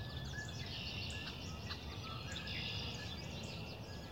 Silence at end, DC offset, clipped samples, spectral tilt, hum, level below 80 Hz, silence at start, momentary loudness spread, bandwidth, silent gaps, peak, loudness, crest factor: 0 s; under 0.1%; under 0.1%; -4 dB/octave; none; -54 dBFS; 0 s; 5 LU; 16 kHz; none; -30 dBFS; -44 LUFS; 14 dB